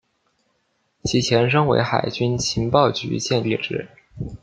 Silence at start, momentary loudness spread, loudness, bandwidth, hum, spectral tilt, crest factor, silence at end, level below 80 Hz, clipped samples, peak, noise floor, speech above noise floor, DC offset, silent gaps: 1.05 s; 13 LU; -20 LUFS; 9.2 kHz; none; -5 dB/octave; 20 dB; 0.05 s; -48 dBFS; under 0.1%; -2 dBFS; -69 dBFS; 49 dB; under 0.1%; none